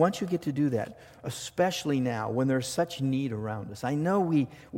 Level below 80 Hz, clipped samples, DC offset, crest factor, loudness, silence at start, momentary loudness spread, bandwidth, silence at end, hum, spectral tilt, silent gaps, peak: -64 dBFS; under 0.1%; under 0.1%; 18 dB; -29 LUFS; 0 s; 9 LU; 17 kHz; 0 s; none; -6 dB/octave; none; -10 dBFS